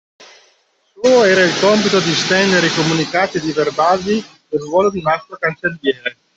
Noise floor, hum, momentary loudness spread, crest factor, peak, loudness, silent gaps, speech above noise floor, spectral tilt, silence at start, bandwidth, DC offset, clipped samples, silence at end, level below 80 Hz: -58 dBFS; none; 8 LU; 14 dB; -2 dBFS; -15 LUFS; none; 43 dB; -4 dB/octave; 0.2 s; 8.2 kHz; under 0.1%; under 0.1%; 0.25 s; -54 dBFS